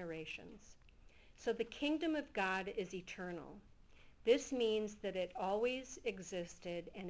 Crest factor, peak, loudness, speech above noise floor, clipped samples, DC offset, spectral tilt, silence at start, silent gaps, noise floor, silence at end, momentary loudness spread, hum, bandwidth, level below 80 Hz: 22 dB; -20 dBFS; -41 LUFS; 22 dB; under 0.1%; under 0.1%; -4.5 dB/octave; 0 s; none; -62 dBFS; 0 s; 13 LU; none; 8 kHz; -68 dBFS